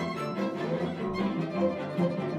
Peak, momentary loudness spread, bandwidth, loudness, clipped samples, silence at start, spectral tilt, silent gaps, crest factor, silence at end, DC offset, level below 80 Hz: -16 dBFS; 3 LU; 12.5 kHz; -31 LUFS; under 0.1%; 0 s; -7.5 dB/octave; none; 14 dB; 0 s; under 0.1%; -60 dBFS